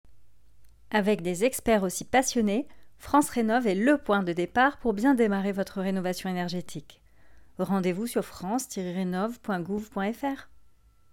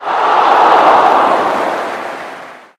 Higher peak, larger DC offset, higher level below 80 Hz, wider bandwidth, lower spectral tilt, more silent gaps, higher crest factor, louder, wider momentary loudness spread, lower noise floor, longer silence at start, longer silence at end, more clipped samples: second, -10 dBFS vs 0 dBFS; neither; about the same, -54 dBFS vs -58 dBFS; first, 17.5 kHz vs 14 kHz; first, -5 dB/octave vs -3.5 dB/octave; neither; first, 18 dB vs 12 dB; second, -27 LUFS vs -10 LUFS; second, 9 LU vs 18 LU; first, -58 dBFS vs -31 dBFS; about the same, 0.05 s vs 0 s; first, 0.65 s vs 0.2 s; second, under 0.1% vs 0.4%